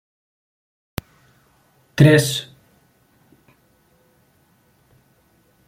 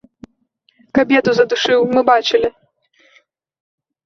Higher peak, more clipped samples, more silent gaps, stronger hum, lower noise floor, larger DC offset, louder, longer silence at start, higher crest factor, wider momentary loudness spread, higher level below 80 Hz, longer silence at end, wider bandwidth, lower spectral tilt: about the same, 0 dBFS vs -2 dBFS; neither; neither; neither; about the same, -59 dBFS vs -61 dBFS; neither; about the same, -16 LUFS vs -15 LUFS; first, 1.95 s vs 0.95 s; first, 24 dB vs 16 dB; first, 22 LU vs 5 LU; about the same, -52 dBFS vs -56 dBFS; first, 3.25 s vs 1.55 s; first, 16.5 kHz vs 7.2 kHz; about the same, -5.5 dB/octave vs -4.5 dB/octave